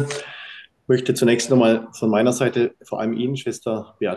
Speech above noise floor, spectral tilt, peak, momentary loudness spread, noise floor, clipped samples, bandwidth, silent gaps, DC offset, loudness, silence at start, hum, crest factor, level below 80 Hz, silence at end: 21 dB; -5.5 dB/octave; -4 dBFS; 15 LU; -41 dBFS; under 0.1%; 12.5 kHz; none; under 0.1%; -20 LUFS; 0 s; none; 16 dB; -64 dBFS; 0 s